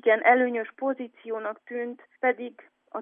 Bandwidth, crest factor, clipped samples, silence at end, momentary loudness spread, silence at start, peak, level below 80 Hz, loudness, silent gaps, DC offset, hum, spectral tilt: 3.7 kHz; 20 dB; under 0.1%; 0 s; 16 LU; 0.05 s; -6 dBFS; under -90 dBFS; -27 LUFS; none; under 0.1%; none; -7.5 dB/octave